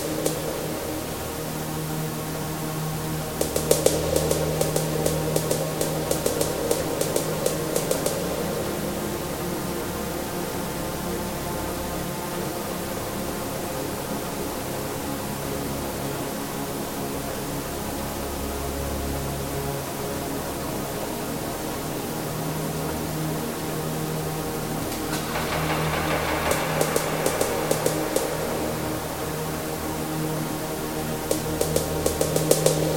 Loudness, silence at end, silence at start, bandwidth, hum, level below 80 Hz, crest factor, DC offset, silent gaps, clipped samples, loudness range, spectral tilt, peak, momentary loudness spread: -27 LUFS; 0 s; 0 s; 17 kHz; none; -42 dBFS; 26 dB; under 0.1%; none; under 0.1%; 5 LU; -4.5 dB/octave; -2 dBFS; 6 LU